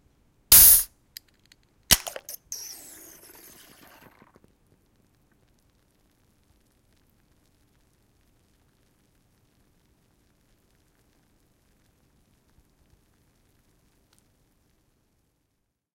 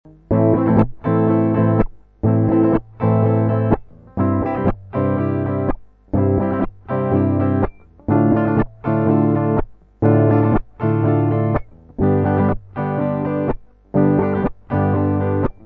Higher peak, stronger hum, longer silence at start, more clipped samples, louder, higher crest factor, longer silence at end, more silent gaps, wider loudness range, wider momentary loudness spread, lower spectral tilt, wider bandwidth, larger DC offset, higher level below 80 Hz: about the same, -2 dBFS vs -2 dBFS; neither; first, 0.5 s vs 0.3 s; neither; first, -15 LUFS vs -18 LUFS; first, 28 dB vs 16 dB; first, 13.4 s vs 0.15 s; neither; first, 26 LU vs 3 LU; first, 31 LU vs 8 LU; second, 0.5 dB/octave vs -12.5 dB/octave; first, 16.5 kHz vs 3.7 kHz; neither; second, -50 dBFS vs -36 dBFS